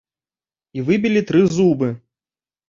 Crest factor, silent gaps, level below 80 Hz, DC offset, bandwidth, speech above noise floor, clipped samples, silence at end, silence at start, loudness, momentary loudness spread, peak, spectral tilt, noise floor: 16 dB; none; -56 dBFS; under 0.1%; 7.6 kHz; over 74 dB; under 0.1%; 0.7 s; 0.75 s; -18 LUFS; 14 LU; -2 dBFS; -7 dB/octave; under -90 dBFS